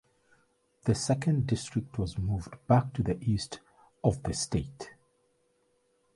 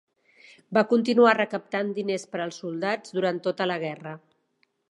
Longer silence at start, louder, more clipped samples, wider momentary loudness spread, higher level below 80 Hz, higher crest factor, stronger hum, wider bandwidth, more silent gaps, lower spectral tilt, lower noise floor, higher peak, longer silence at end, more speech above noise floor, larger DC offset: first, 0.85 s vs 0.7 s; second, -31 LUFS vs -25 LUFS; neither; about the same, 13 LU vs 14 LU; first, -48 dBFS vs -78 dBFS; about the same, 22 dB vs 22 dB; neither; about the same, 11.5 kHz vs 11 kHz; neither; about the same, -6 dB/octave vs -5.5 dB/octave; about the same, -72 dBFS vs -71 dBFS; second, -10 dBFS vs -4 dBFS; first, 1.25 s vs 0.75 s; second, 42 dB vs 47 dB; neither